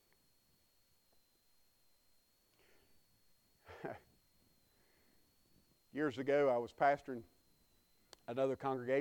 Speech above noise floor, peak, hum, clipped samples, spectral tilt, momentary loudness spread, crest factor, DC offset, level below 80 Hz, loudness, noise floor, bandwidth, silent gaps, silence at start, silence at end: 38 dB; -20 dBFS; none; under 0.1%; -6.5 dB/octave; 17 LU; 22 dB; under 0.1%; -80 dBFS; -37 LUFS; -75 dBFS; 19 kHz; none; 3.7 s; 0 s